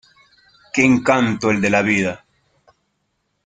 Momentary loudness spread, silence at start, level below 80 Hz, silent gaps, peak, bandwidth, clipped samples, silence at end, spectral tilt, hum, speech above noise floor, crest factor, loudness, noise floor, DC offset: 10 LU; 0.75 s; -54 dBFS; none; -2 dBFS; 9.4 kHz; under 0.1%; 1.3 s; -5.5 dB/octave; none; 54 dB; 18 dB; -17 LUFS; -70 dBFS; under 0.1%